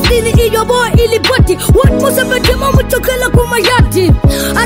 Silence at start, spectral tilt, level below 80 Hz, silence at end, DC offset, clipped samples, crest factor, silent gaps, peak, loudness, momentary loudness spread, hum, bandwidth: 0 s; -5 dB/octave; -16 dBFS; 0 s; under 0.1%; under 0.1%; 10 dB; none; 0 dBFS; -10 LUFS; 2 LU; none; 16.5 kHz